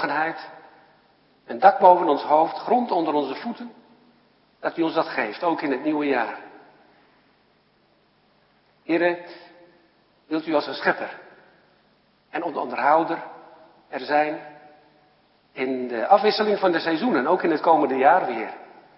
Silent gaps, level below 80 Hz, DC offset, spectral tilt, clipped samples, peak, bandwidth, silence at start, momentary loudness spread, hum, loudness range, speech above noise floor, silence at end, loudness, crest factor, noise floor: none; -80 dBFS; under 0.1%; -9 dB/octave; under 0.1%; 0 dBFS; 5.8 kHz; 0 s; 18 LU; 50 Hz at -70 dBFS; 9 LU; 41 dB; 0.35 s; -22 LUFS; 24 dB; -62 dBFS